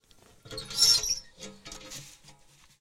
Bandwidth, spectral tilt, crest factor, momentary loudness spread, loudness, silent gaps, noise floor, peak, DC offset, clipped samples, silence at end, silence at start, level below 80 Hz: 16.5 kHz; 0.5 dB/octave; 22 dB; 24 LU; -23 LUFS; none; -58 dBFS; -10 dBFS; under 0.1%; under 0.1%; 0.5 s; 0.45 s; -56 dBFS